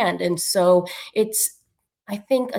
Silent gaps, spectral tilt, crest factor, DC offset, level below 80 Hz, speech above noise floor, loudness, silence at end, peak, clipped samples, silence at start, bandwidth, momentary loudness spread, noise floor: none; -3.5 dB/octave; 16 dB; under 0.1%; -68 dBFS; 48 dB; -21 LUFS; 0 s; -6 dBFS; under 0.1%; 0 s; 19.5 kHz; 11 LU; -69 dBFS